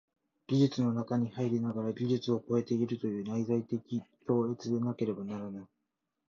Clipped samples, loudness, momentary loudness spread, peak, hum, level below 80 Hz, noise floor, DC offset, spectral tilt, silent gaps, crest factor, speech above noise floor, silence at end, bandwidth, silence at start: under 0.1%; -33 LUFS; 10 LU; -16 dBFS; none; -72 dBFS; -85 dBFS; under 0.1%; -8 dB/octave; none; 18 dB; 53 dB; 0.65 s; 7.2 kHz; 0.5 s